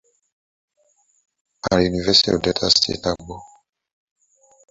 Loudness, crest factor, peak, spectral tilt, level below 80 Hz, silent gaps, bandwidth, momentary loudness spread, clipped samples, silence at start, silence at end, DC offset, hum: -18 LUFS; 22 dB; 0 dBFS; -3.5 dB/octave; -44 dBFS; none; 8 kHz; 16 LU; under 0.1%; 1.65 s; 1.25 s; under 0.1%; none